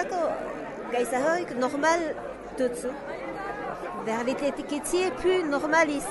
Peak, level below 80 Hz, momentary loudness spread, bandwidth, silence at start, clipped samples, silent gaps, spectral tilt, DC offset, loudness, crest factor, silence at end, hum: -10 dBFS; -54 dBFS; 11 LU; 11.5 kHz; 0 s; under 0.1%; none; -3.5 dB/octave; under 0.1%; -28 LUFS; 18 dB; 0 s; none